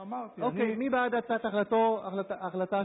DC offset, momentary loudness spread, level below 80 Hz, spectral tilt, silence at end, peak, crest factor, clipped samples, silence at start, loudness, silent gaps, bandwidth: under 0.1%; 8 LU; -70 dBFS; -10 dB/octave; 0 s; -18 dBFS; 12 dB; under 0.1%; 0 s; -30 LUFS; none; 4 kHz